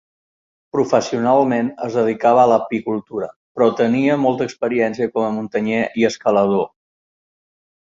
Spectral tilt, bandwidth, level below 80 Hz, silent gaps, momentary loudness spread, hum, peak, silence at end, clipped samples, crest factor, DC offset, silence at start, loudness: -6 dB/octave; 7.6 kHz; -62 dBFS; 3.36-3.55 s; 9 LU; none; -2 dBFS; 1.15 s; under 0.1%; 16 dB; under 0.1%; 0.75 s; -18 LUFS